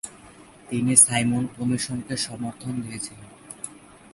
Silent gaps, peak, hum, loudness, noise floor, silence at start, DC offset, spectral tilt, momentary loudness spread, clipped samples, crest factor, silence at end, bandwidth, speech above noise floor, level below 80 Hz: none; 0 dBFS; none; -22 LUFS; -48 dBFS; 0.05 s; under 0.1%; -3 dB/octave; 22 LU; under 0.1%; 26 dB; 0.4 s; 12 kHz; 24 dB; -58 dBFS